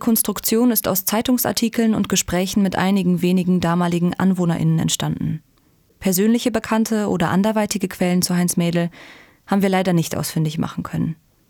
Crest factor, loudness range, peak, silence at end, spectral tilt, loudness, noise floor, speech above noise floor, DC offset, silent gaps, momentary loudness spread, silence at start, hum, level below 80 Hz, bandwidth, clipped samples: 16 dB; 2 LU; -4 dBFS; 0.35 s; -5 dB/octave; -19 LUFS; -58 dBFS; 39 dB; under 0.1%; none; 6 LU; 0 s; none; -48 dBFS; over 20 kHz; under 0.1%